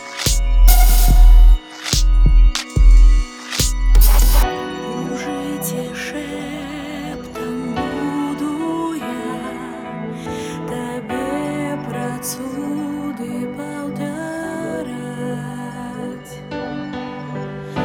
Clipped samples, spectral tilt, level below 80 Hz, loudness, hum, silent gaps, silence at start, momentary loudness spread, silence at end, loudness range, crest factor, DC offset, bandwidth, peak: under 0.1%; -5 dB/octave; -16 dBFS; -20 LUFS; none; none; 0 s; 14 LU; 0 s; 11 LU; 16 dB; under 0.1%; 19.5 kHz; 0 dBFS